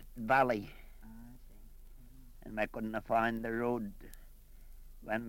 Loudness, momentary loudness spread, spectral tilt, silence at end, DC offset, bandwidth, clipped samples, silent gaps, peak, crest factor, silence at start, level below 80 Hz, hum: -34 LUFS; 26 LU; -6.5 dB/octave; 0 s; under 0.1%; 16.5 kHz; under 0.1%; none; -16 dBFS; 22 dB; 0 s; -52 dBFS; none